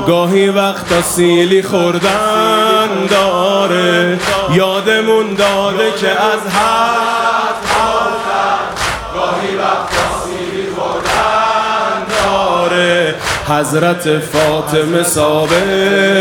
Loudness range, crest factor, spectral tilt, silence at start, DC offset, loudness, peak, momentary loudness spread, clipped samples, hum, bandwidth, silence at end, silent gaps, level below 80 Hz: 3 LU; 12 dB; -4 dB/octave; 0 s; under 0.1%; -12 LUFS; 0 dBFS; 5 LU; under 0.1%; none; 18 kHz; 0 s; none; -40 dBFS